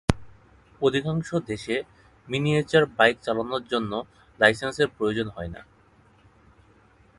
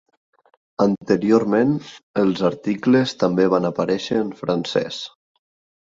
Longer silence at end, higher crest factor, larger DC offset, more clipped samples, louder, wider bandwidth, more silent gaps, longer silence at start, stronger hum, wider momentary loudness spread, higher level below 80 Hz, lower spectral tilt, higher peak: first, 1.55 s vs 0.75 s; first, 26 dB vs 18 dB; neither; neither; second, -25 LUFS vs -20 LUFS; first, 11.5 kHz vs 7.8 kHz; second, none vs 2.03-2.14 s; second, 0.1 s vs 0.8 s; neither; first, 13 LU vs 10 LU; first, -46 dBFS vs -60 dBFS; about the same, -5.5 dB/octave vs -6.5 dB/octave; about the same, 0 dBFS vs -2 dBFS